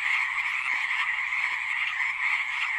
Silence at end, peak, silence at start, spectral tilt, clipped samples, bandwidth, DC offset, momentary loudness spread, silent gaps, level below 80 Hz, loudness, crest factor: 0 s; -14 dBFS; 0 s; 2 dB/octave; under 0.1%; 14.5 kHz; under 0.1%; 2 LU; none; -70 dBFS; -26 LUFS; 14 dB